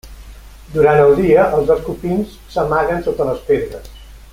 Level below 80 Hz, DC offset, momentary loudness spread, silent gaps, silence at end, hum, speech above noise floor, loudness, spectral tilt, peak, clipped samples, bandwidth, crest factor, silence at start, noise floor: -36 dBFS; under 0.1%; 12 LU; none; 0.15 s; none; 22 dB; -15 LUFS; -7.5 dB/octave; -2 dBFS; under 0.1%; 16 kHz; 14 dB; 0.05 s; -36 dBFS